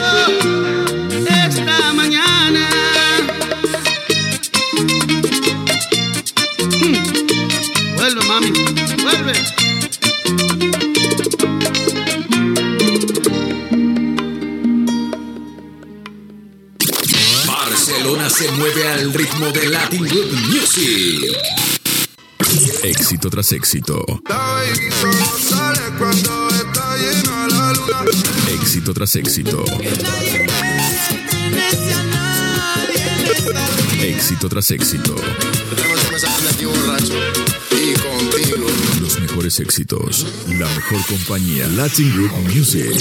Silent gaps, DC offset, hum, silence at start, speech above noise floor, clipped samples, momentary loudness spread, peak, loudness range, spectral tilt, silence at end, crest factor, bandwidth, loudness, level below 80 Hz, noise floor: none; under 0.1%; none; 0 s; 22 dB; under 0.1%; 6 LU; 0 dBFS; 3 LU; -3 dB/octave; 0 s; 16 dB; 19 kHz; -15 LUFS; -44 dBFS; -39 dBFS